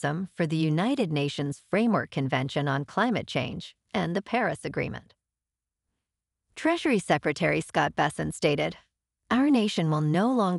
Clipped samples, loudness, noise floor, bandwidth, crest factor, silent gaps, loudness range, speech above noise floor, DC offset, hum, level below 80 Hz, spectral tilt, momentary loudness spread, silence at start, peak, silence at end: under 0.1%; -27 LUFS; -89 dBFS; 11.5 kHz; 20 dB; none; 5 LU; 63 dB; under 0.1%; none; -60 dBFS; -6 dB/octave; 8 LU; 0 s; -8 dBFS; 0 s